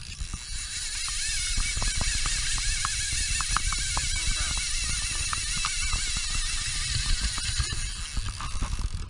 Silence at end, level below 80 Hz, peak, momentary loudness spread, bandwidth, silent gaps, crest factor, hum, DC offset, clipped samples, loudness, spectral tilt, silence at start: 0 s; -32 dBFS; -8 dBFS; 7 LU; 11.5 kHz; none; 22 dB; none; under 0.1%; under 0.1%; -28 LUFS; -0.5 dB/octave; 0 s